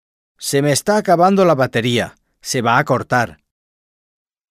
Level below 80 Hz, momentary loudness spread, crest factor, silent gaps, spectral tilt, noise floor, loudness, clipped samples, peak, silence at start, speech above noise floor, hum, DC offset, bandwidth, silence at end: -54 dBFS; 12 LU; 16 dB; none; -4.5 dB/octave; under -90 dBFS; -16 LUFS; under 0.1%; -2 dBFS; 0.4 s; over 75 dB; none; under 0.1%; 15.5 kHz; 1.15 s